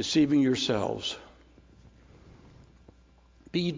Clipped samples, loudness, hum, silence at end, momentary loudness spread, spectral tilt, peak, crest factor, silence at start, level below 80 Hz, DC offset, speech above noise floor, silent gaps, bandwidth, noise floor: under 0.1%; -27 LUFS; none; 0 s; 11 LU; -5 dB/octave; -14 dBFS; 16 dB; 0 s; -58 dBFS; under 0.1%; 33 dB; none; 7.6 kHz; -59 dBFS